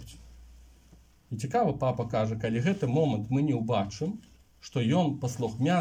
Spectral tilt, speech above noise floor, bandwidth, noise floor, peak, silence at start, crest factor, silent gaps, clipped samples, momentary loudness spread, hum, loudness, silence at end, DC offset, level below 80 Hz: -7 dB/octave; 30 dB; 15.5 kHz; -57 dBFS; -14 dBFS; 0 s; 16 dB; none; under 0.1%; 10 LU; none; -29 LUFS; 0 s; under 0.1%; -56 dBFS